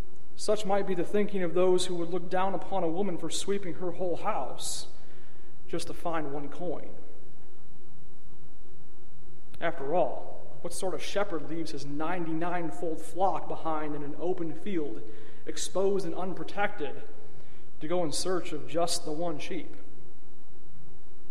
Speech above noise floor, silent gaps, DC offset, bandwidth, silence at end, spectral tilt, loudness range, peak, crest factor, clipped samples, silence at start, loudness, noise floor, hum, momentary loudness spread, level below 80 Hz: 24 dB; none; 8%; 15 kHz; 0.05 s; -4.5 dB/octave; 9 LU; -12 dBFS; 20 dB; under 0.1%; 0 s; -33 LUFS; -56 dBFS; none; 12 LU; -60 dBFS